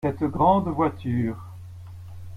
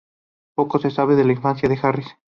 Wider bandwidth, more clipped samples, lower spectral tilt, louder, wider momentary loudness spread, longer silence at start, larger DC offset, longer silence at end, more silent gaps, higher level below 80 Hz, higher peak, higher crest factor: first, 14 kHz vs 6.8 kHz; neither; about the same, -9.5 dB/octave vs -9 dB/octave; second, -23 LUFS vs -20 LUFS; first, 22 LU vs 9 LU; second, 0.05 s vs 0.6 s; neither; second, 0 s vs 0.25 s; neither; about the same, -50 dBFS vs -54 dBFS; about the same, -6 dBFS vs -4 dBFS; about the same, 18 dB vs 16 dB